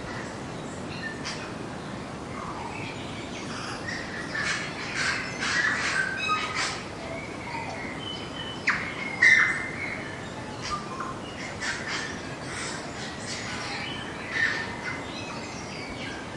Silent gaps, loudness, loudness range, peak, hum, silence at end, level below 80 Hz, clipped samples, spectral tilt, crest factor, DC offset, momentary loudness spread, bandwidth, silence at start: none; -29 LUFS; 9 LU; -6 dBFS; none; 0 s; -54 dBFS; under 0.1%; -3 dB/octave; 24 dB; under 0.1%; 11 LU; 11.5 kHz; 0 s